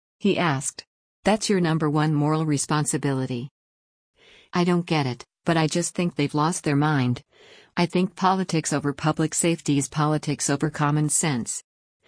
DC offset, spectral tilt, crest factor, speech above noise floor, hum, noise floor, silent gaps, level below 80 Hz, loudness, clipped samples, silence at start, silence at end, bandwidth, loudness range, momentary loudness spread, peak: under 0.1%; -5 dB/octave; 18 dB; 22 dB; none; -45 dBFS; 0.87-1.23 s, 3.51-4.14 s; -60 dBFS; -24 LUFS; under 0.1%; 0.2 s; 0.45 s; 10.5 kHz; 3 LU; 8 LU; -6 dBFS